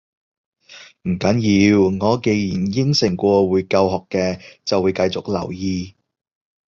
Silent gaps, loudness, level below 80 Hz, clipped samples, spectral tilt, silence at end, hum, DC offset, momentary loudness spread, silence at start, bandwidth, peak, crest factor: none; -18 LUFS; -44 dBFS; under 0.1%; -6 dB/octave; 0.75 s; none; under 0.1%; 10 LU; 0.7 s; 7.4 kHz; -2 dBFS; 16 dB